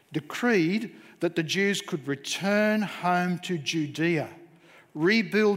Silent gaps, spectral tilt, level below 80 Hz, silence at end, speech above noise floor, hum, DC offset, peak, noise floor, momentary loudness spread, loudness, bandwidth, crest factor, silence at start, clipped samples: none; -5 dB/octave; -76 dBFS; 0 s; 29 dB; none; under 0.1%; -12 dBFS; -55 dBFS; 9 LU; -26 LUFS; 16 kHz; 16 dB; 0.1 s; under 0.1%